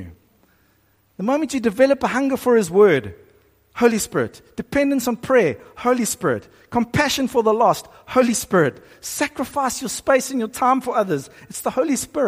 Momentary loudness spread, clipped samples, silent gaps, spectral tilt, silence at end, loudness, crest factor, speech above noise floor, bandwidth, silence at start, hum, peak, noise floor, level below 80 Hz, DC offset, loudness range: 10 LU; under 0.1%; none; -4.5 dB/octave; 0 s; -20 LUFS; 18 dB; 41 dB; 15.5 kHz; 0 s; none; -2 dBFS; -60 dBFS; -52 dBFS; under 0.1%; 2 LU